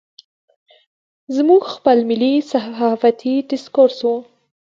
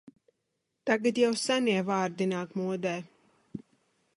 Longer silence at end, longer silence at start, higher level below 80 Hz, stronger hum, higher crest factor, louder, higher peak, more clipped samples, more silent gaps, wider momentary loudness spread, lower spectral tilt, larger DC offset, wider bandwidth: about the same, 0.5 s vs 0.6 s; first, 1.3 s vs 0.05 s; first, -68 dBFS vs -74 dBFS; neither; about the same, 16 dB vs 20 dB; first, -16 LUFS vs -29 LUFS; first, 0 dBFS vs -10 dBFS; neither; neither; second, 8 LU vs 20 LU; first, -6 dB/octave vs -4.5 dB/octave; neither; second, 7.6 kHz vs 11.5 kHz